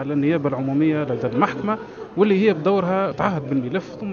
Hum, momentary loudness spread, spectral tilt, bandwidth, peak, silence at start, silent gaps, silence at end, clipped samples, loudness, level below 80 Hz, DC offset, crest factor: none; 9 LU; -8.5 dB/octave; 7 kHz; -2 dBFS; 0 s; none; 0 s; under 0.1%; -21 LUFS; -58 dBFS; under 0.1%; 18 dB